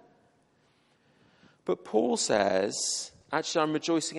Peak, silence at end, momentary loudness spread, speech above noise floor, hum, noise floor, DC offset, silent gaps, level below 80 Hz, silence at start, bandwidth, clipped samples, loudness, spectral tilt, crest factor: -10 dBFS; 0 s; 8 LU; 39 dB; none; -67 dBFS; under 0.1%; none; -70 dBFS; 1.65 s; 11.5 kHz; under 0.1%; -28 LUFS; -3 dB/octave; 22 dB